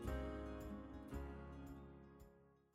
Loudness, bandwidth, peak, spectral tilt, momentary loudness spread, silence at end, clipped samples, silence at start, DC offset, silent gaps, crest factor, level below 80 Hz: -52 LUFS; 15 kHz; -32 dBFS; -7.5 dB/octave; 15 LU; 0.15 s; under 0.1%; 0 s; under 0.1%; none; 18 dB; -56 dBFS